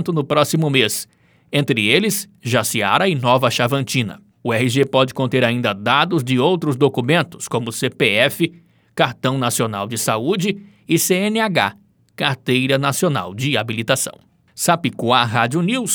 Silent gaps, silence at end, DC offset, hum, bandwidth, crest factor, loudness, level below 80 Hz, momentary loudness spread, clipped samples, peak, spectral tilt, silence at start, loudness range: none; 0 s; under 0.1%; none; over 20 kHz; 18 dB; -18 LUFS; -64 dBFS; 7 LU; under 0.1%; 0 dBFS; -4 dB/octave; 0 s; 2 LU